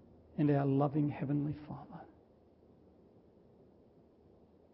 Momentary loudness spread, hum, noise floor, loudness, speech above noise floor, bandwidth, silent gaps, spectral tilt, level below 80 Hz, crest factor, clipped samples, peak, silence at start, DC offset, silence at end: 18 LU; none; -64 dBFS; -34 LUFS; 31 dB; 5.4 kHz; none; -9.5 dB/octave; -68 dBFS; 20 dB; under 0.1%; -18 dBFS; 0.35 s; under 0.1%; 2.7 s